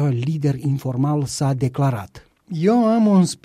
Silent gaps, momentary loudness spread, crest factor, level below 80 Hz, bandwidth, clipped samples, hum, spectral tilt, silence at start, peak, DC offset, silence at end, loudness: none; 8 LU; 12 dB; -54 dBFS; 14 kHz; under 0.1%; none; -7 dB/octave; 0 s; -6 dBFS; under 0.1%; 0.1 s; -19 LUFS